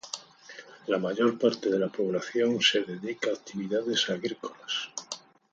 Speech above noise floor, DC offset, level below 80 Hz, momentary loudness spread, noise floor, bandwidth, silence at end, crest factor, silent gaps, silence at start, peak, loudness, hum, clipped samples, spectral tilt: 21 dB; under 0.1%; -74 dBFS; 17 LU; -49 dBFS; 9 kHz; 0.35 s; 22 dB; none; 0.05 s; -6 dBFS; -28 LUFS; none; under 0.1%; -3.5 dB/octave